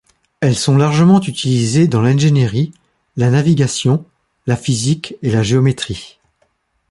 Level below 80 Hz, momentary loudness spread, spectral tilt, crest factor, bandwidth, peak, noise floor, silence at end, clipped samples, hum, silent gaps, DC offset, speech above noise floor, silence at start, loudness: -46 dBFS; 10 LU; -6 dB/octave; 14 dB; 11.5 kHz; -2 dBFS; -62 dBFS; 0.85 s; under 0.1%; none; none; under 0.1%; 49 dB; 0.4 s; -15 LUFS